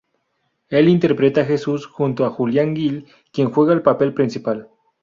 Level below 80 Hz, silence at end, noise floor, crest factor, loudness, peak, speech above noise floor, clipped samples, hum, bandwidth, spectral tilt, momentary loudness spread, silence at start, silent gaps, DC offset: -60 dBFS; 0.4 s; -70 dBFS; 16 dB; -18 LUFS; -2 dBFS; 52 dB; under 0.1%; none; 7.4 kHz; -8 dB/octave; 10 LU; 0.7 s; none; under 0.1%